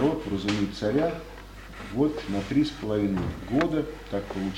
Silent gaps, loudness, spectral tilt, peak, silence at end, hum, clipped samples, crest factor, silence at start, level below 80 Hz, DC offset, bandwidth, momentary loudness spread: none; -28 LUFS; -6.5 dB/octave; -10 dBFS; 0 s; none; under 0.1%; 18 dB; 0 s; -44 dBFS; under 0.1%; 15.5 kHz; 13 LU